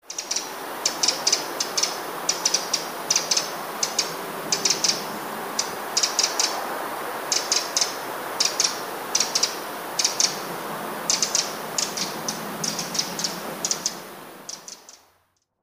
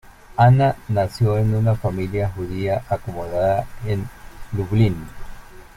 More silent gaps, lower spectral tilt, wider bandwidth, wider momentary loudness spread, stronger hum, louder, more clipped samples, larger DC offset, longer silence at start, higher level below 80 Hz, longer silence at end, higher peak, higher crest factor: neither; second, 0 dB/octave vs -8.5 dB/octave; about the same, 15.5 kHz vs 14.5 kHz; about the same, 11 LU vs 12 LU; neither; about the same, -23 LUFS vs -21 LUFS; neither; neither; about the same, 0.05 s vs 0.05 s; second, -72 dBFS vs -40 dBFS; first, 0.65 s vs 0.15 s; about the same, -4 dBFS vs -2 dBFS; about the same, 22 dB vs 18 dB